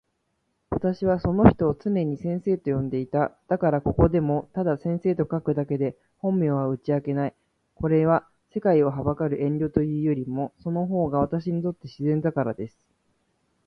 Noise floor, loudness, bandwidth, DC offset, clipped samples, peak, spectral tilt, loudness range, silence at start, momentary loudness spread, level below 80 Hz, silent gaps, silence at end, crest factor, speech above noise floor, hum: -74 dBFS; -25 LUFS; 6 kHz; under 0.1%; under 0.1%; 0 dBFS; -11 dB/octave; 3 LU; 0.7 s; 9 LU; -44 dBFS; none; 1 s; 24 dB; 50 dB; none